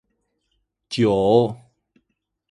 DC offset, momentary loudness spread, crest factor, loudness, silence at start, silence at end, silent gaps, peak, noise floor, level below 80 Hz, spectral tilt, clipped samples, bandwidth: under 0.1%; 15 LU; 20 dB; -19 LUFS; 0.9 s; 0.95 s; none; -2 dBFS; -75 dBFS; -54 dBFS; -7 dB/octave; under 0.1%; 11 kHz